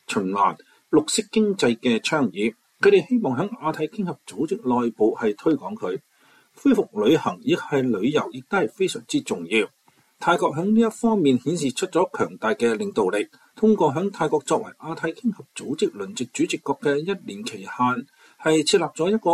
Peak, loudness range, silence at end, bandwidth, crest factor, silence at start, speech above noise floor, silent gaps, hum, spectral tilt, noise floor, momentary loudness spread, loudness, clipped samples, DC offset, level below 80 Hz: -6 dBFS; 4 LU; 0 s; 14 kHz; 16 dB; 0.1 s; 35 dB; none; none; -5 dB/octave; -57 dBFS; 10 LU; -23 LUFS; under 0.1%; under 0.1%; -64 dBFS